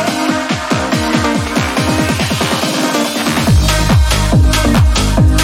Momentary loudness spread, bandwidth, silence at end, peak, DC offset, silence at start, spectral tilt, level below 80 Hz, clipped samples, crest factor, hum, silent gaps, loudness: 4 LU; 17 kHz; 0 s; 0 dBFS; under 0.1%; 0 s; -4.5 dB/octave; -18 dBFS; under 0.1%; 12 dB; none; none; -13 LUFS